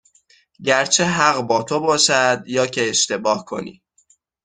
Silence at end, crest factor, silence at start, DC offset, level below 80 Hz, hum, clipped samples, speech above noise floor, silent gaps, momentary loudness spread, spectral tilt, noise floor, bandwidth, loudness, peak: 0.7 s; 18 dB; 0.6 s; under 0.1%; -62 dBFS; none; under 0.1%; 41 dB; none; 11 LU; -2 dB/octave; -59 dBFS; 10 kHz; -17 LUFS; 0 dBFS